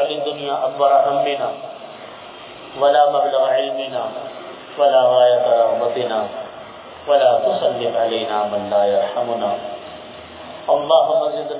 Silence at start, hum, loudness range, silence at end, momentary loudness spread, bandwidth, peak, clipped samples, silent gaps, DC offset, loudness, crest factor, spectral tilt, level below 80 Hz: 0 s; none; 3 LU; 0 s; 21 LU; 4 kHz; -2 dBFS; under 0.1%; none; under 0.1%; -17 LUFS; 16 dB; -8 dB/octave; -62 dBFS